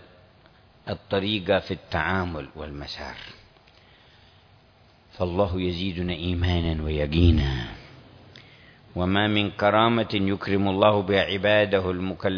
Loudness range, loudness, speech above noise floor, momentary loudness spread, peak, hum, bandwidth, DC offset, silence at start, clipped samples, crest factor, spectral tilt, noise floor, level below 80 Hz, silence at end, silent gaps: 11 LU; -24 LUFS; 32 dB; 15 LU; -4 dBFS; none; 5.4 kHz; under 0.1%; 0.85 s; under 0.1%; 22 dB; -7.5 dB/octave; -56 dBFS; -38 dBFS; 0 s; none